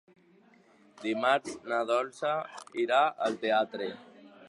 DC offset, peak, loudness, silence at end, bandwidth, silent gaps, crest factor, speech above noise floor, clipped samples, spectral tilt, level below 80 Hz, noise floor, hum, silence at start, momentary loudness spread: under 0.1%; -12 dBFS; -30 LUFS; 0 s; 11.5 kHz; none; 20 dB; 32 dB; under 0.1%; -4 dB/octave; -80 dBFS; -61 dBFS; none; 1 s; 12 LU